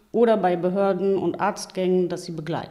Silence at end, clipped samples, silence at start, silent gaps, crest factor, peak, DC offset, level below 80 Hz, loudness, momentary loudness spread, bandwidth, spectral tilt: 0 s; under 0.1%; 0.15 s; none; 14 dB; -8 dBFS; under 0.1%; -64 dBFS; -23 LUFS; 10 LU; 13 kHz; -6.5 dB/octave